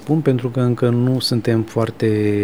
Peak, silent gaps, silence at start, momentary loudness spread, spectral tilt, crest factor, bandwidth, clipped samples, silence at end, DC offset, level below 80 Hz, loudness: -2 dBFS; none; 0 s; 2 LU; -7 dB/octave; 14 dB; 14.5 kHz; under 0.1%; 0 s; 0.5%; -56 dBFS; -18 LUFS